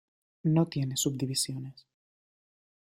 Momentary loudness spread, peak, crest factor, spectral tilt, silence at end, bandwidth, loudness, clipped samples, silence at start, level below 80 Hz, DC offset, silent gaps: 10 LU; -12 dBFS; 20 dB; -5 dB/octave; 1.15 s; 16 kHz; -30 LUFS; under 0.1%; 0.45 s; -70 dBFS; under 0.1%; none